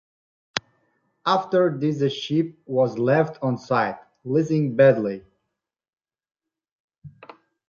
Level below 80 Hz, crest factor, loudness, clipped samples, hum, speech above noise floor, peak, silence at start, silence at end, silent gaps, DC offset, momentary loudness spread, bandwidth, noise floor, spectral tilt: -66 dBFS; 24 dB; -22 LUFS; under 0.1%; none; 62 dB; 0 dBFS; 0.55 s; 0.6 s; 6.72-6.88 s, 6.98-7.02 s; under 0.1%; 13 LU; 7.4 kHz; -83 dBFS; -7 dB/octave